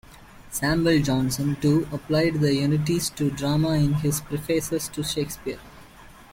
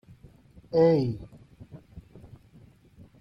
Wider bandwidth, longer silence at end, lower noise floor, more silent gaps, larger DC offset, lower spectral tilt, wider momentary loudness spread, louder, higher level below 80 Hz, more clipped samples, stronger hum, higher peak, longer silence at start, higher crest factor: first, 17 kHz vs 6.2 kHz; second, 0.1 s vs 0.95 s; second, -47 dBFS vs -55 dBFS; neither; neither; second, -5.5 dB/octave vs -9.5 dB/octave; second, 7 LU vs 28 LU; about the same, -24 LUFS vs -24 LUFS; first, -46 dBFS vs -56 dBFS; neither; neither; about the same, -10 dBFS vs -10 dBFS; second, 0.1 s vs 0.7 s; second, 14 dB vs 20 dB